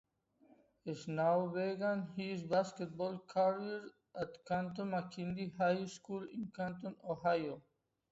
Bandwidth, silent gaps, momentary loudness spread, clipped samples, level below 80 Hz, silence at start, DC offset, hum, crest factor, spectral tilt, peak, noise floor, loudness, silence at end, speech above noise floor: 8 kHz; none; 11 LU; under 0.1%; -74 dBFS; 0.85 s; under 0.1%; none; 18 dB; -5.5 dB/octave; -22 dBFS; -70 dBFS; -39 LUFS; 0.5 s; 31 dB